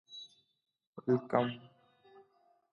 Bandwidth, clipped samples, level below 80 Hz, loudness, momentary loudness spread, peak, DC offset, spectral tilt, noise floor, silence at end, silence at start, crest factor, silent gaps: 6.8 kHz; under 0.1%; -82 dBFS; -34 LUFS; 22 LU; -12 dBFS; under 0.1%; -7.5 dB/octave; -71 dBFS; 1.15 s; 0.1 s; 26 dB; 0.87-0.93 s